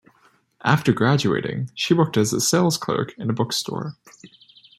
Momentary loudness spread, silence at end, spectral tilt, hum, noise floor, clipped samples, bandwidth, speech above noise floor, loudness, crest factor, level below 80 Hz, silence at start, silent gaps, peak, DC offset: 9 LU; 0.5 s; -4.5 dB/octave; none; -60 dBFS; under 0.1%; 16 kHz; 38 dB; -21 LUFS; 20 dB; -60 dBFS; 0.65 s; none; -2 dBFS; under 0.1%